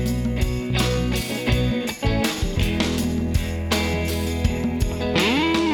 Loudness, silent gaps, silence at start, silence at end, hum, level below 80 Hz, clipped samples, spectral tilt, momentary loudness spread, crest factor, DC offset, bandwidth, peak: -22 LUFS; none; 0 s; 0 s; none; -28 dBFS; under 0.1%; -5 dB/octave; 5 LU; 16 dB; under 0.1%; over 20 kHz; -4 dBFS